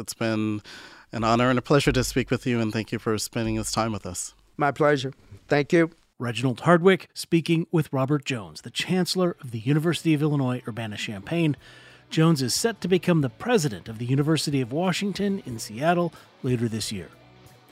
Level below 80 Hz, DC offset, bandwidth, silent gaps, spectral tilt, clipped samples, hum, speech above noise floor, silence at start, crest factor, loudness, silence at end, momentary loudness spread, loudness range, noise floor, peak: -50 dBFS; under 0.1%; 16 kHz; none; -5.5 dB/octave; under 0.1%; none; 27 dB; 0 s; 22 dB; -25 LUFS; 0.65 s; 11 LU; 3 LU; -52 dBFS; -4 dBFS